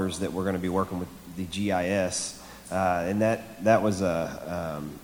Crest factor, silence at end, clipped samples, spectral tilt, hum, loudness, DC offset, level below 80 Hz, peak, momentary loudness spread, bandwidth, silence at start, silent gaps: 20 dB; 0 s; under 0.1%; -5 dB/octave; none; -28 LUFS; under 0.1%; -54 dBFS; -8 dBFS; 11 LU; over 20 kHz; 0 s; none